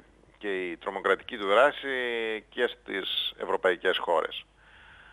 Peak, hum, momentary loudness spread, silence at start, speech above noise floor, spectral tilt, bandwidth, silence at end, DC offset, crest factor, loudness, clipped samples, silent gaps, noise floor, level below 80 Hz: -10 dBFS; none; 11 LU; 0.4 s; 26 dB; -3.5 dB/octave; 13.5 kHz; 0.2 s; under 0.1%; 20 dB; -28 LUFS; under 0.1%; none; -54 dBFS; -64 dBFS